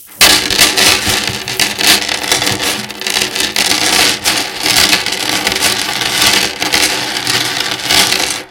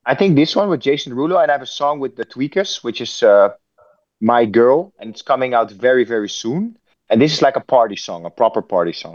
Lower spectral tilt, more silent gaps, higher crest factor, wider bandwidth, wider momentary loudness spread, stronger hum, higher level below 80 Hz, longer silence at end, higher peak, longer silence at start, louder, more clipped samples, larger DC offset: second, -0.5 dB/octave vs -5.5 dB/octave; neither; about the same, 12 dB vs 16 dB; first, over 20 kHz vs 7.6 kHz; second, 7 LU vs 11 LU; neither; first, -40 dBFS vs -68 dBFS; about the same, 0 s vs 0 s; about the same, 0 dBFS vs 0 dBFS; about the same, 0 s vs 0.05 s; first, -10 LUFS vs -16 LUFS; first, 0.5% vs under 0.1%; neither